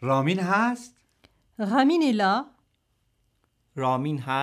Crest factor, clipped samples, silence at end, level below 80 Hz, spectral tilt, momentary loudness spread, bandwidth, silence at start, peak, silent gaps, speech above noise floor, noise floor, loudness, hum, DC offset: 18 dB; under 0.1%; 0 s; -72 dBFS; -6.5 dB/octave; 13 LU; 13.5 kHz; 0 s; -8 dBFS; none; 48 dB; -71 dBFS; -24 LUFS; none; under 0.1%